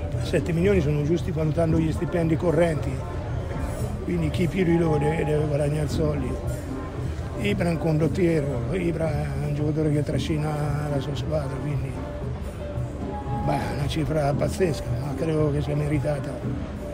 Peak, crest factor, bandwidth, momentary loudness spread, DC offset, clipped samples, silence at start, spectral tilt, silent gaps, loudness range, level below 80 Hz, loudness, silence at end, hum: -8 dBFS; 16 dB; 16 kHz; 9 LU; under 0.1%; under 0.1%; 0 s; -7.5 dB/octave; none; 4 LU; -36 dBFS; -25 LUFS; 0 s; none